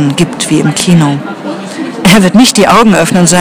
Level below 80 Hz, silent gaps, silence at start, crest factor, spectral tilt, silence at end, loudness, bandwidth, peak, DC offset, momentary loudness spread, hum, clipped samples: -36 dBFS; none; 0 s; 8 dB; -4.5 dB/octave; 0 s; -7 LUFS; over 20 kHz; 0 dBFS; under 0.1%; 14 LU; none; 4%